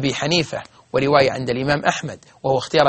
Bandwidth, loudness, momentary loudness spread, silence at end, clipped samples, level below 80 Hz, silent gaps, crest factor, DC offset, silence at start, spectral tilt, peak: 8.8 kHz; -20 LUFS; 11 LU; 0 s; under 0.1%; -50 dBFS; none; 20 dB; under 0.1%; 0 s; -4.5 dB/octave; 0 dBFS